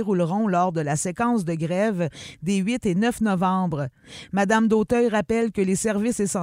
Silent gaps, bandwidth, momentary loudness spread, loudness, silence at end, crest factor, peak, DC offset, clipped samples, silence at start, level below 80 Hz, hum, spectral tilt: none; 15.5 kHz; 8 LU; -23 LUFS; 0 s; 16 dB; -6 dBFS; under 0.1%; under 0.1%; 0 s; -52 dBFS; none; -5.5 dB/octave